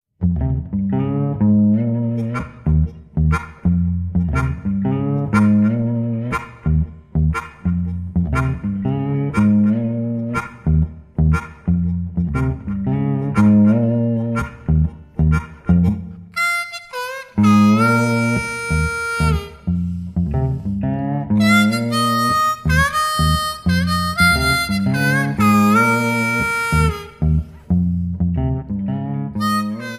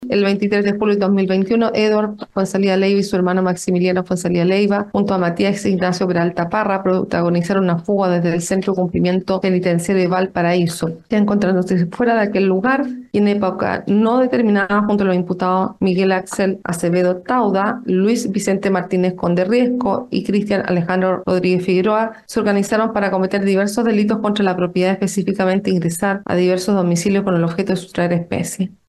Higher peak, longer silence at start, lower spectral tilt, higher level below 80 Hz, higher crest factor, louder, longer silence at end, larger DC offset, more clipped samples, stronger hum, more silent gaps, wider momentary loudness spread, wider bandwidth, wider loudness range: about the same, -2 dBFS vs -4 dBFS; first, 0.2 s vs 0 s; about the same, -6.5 dB/octave vs -6.5 dB/octave; first, -28 dBFS vs -52 dBFS; about the same, 16 dB vs 12 dB; about the same, -18 LUFS vs -17 LUFS; second, 0 s vs 0.15 s; neither; neither; neither; neither; first, 9 LU vs 4 LU; first, 15.5 kHz vs 12.5 kHz; first, 4 LU vs 1 LU